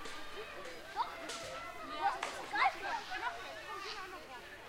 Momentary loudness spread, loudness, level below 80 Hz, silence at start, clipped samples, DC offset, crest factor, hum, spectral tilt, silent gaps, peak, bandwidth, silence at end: 13 LU; -40 LUFS; -64 dBFS; 0 s; under 0.1%; under 0.1%; 22 dB; none; -1.5 dB/octave; none; -18 dBFS; 16 kHz; 0 s